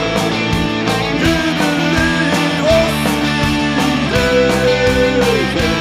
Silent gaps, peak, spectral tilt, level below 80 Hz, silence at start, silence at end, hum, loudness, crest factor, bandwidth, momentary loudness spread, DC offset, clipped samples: none; 0 dBFS; -5 dB/octave; -30 dBFS; 0 s; 0 s; none; -14 LUFS; 14 dB; 15.5 kHz; 3 LU; under 0.1%; under 0.1%